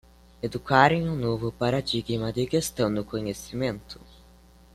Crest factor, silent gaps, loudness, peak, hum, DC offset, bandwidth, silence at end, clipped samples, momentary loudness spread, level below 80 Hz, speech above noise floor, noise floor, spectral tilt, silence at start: 24 dB; none; -26 LUFS; -4 dBFS; none; under 0.1%; 15 kHz; 0.8 s; under 0.1%; 14 LU; -50 dBFS; 28 dB; -53 dBFS; -5.5 dB/octave; 0.45 s